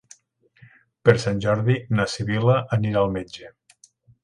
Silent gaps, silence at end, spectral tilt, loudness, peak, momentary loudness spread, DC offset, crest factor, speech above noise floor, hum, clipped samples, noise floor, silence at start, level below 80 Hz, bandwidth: none; 0.75 s; -6.5 dB/octave; -22 LUFS; 0 dBFS; 8 LU; under 0.1%; 22 dB; 39 dB; none; under 0.1%; -60 dBFS; 1.05 s; -50 dBFS; 11 kHz